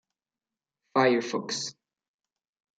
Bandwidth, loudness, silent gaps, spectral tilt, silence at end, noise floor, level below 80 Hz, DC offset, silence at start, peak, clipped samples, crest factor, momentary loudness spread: 9.4 kHz; -27 LUFS; none; -3.5 dB/octave; 1.05 s; under -90 dBFS; -84 dBFS; under 0.1%; 0.95 s; -10 dBFS; under 0.1%; 22 dB; 9 LU